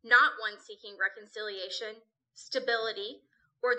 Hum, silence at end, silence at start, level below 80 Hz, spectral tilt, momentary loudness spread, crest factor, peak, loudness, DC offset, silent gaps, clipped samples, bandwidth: none; 0 s; 0.05 s; -86 dBFS; -0.5 dB/octave; 18 LU; 22 dB; -10 dBFS; -31 LUFS; under 0.1%; none; under 0.1%; 8.8 kHz